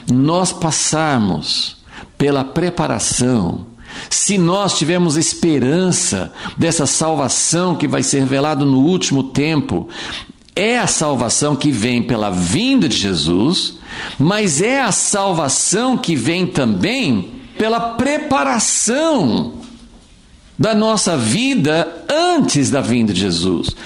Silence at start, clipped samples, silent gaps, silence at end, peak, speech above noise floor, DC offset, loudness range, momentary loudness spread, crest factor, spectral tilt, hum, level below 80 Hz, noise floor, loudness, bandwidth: 0 s; under 0.1%; none; 0 s; -4 dBFS; 29 dB; under 0.1%; 2 LU; 7 LU; 12 dB; -4 dB/octave; none; -44 dBFS; -44 dBFS; -15 LUFS; 11.5 kHz